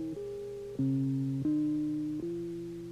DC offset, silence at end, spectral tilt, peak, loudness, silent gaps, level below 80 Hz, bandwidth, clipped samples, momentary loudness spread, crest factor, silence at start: under 0.1%; 0 s; -9.5 dB/octave; -24 dBFS; -34 LUFS; none; -62 dBFS; 11 kHz; under 0.1%; 10 LU; 10 dB; 0 s